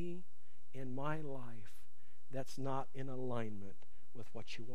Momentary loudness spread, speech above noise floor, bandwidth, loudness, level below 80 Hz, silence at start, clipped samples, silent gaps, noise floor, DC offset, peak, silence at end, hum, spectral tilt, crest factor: 15 LU; 28 dB; 15 kHz; -46 LUFS; -72 dBFS; 0 s; under 0.1%; none; -73 dBFS; 2%; -22 dBFS; 0 s; none; -6.5 dB/octave; 22 dB